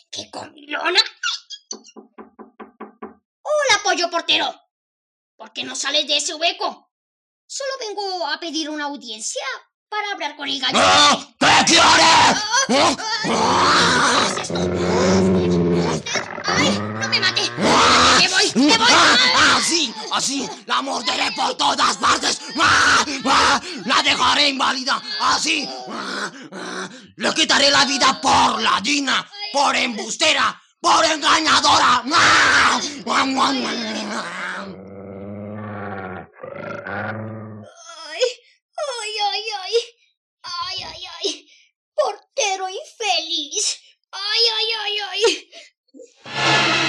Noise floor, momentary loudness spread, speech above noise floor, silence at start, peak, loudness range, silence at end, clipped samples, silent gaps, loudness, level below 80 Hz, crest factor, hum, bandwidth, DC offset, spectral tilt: -43 dBFS; 19 LU; 25 dB; 0.1 s; -2 dBFS; 12 LU; 0 s; under 0.1%; 3.25-3.44 s, 4.71-5.38 s, 6.91-7.48 s, 9.74-9.86 s, 38.62-38.69 s, 40.17-40.37 s, 41.76-41.92 s, 45.77-45.84 s; -17 LUFS; -56 dBFS; 16 dB; none; 13.5 kHz; under 0.1%; -2 dB/octave